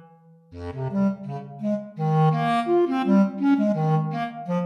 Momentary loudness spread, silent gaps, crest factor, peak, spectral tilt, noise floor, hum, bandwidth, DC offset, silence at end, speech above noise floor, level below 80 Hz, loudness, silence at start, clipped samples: 12 LU; none; 12 dB; -10 dBFS; -9 dB/octave; -52 dBFS; none; 9.2 kHz; under 0.1%; 0 s; 25 dB; -58 dBFS; -23 LUFS; 0.5 s; under 0.1%